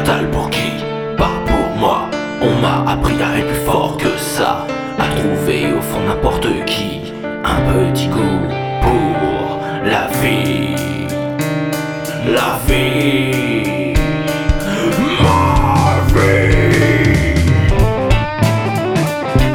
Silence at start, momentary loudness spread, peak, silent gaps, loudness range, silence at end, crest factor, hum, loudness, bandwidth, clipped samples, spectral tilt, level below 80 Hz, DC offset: 0 s; 8 LU; 0 dBFS; none; 4 LU; 0 s; 14 dB; none; -15 LUFS; over 20 kHz; under 0.1%; -6 dB/octave; -24 dBFS; under 0.1%